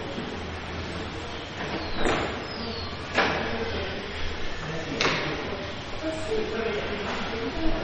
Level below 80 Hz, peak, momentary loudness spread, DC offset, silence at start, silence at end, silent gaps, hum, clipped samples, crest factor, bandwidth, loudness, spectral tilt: -38 dBFS; -6 dBFS; 9 LU; under 0.1%; 0 s; 0 s; none; none; under 0.1%; 24 dB; 8.8 kHz; -30 LUFS; -4.5 dB/octave